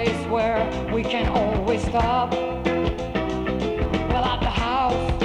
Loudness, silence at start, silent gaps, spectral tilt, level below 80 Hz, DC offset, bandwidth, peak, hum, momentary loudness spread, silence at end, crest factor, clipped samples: -23 LUFS; 0 s; none; -6.5 dB/octave; -32 dBFS; under 0.1%; 11 kHz; -6 dBFS; none; 3 LU; 0 s; 16 dB; under 0.1%